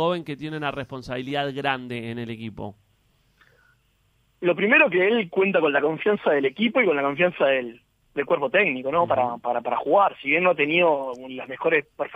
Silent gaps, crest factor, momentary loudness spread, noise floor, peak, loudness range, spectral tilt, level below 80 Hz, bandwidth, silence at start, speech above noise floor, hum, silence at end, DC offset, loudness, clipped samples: none; 18 dB; 14 LU; -65 dBFS; -4 dBFS; 10 LU; -7 dB/octave; -62 dBFS; 9.4 kHz; 0 s; 42 dB; none; 0 s; under 0.1%; -22 LUFS; under 0.1%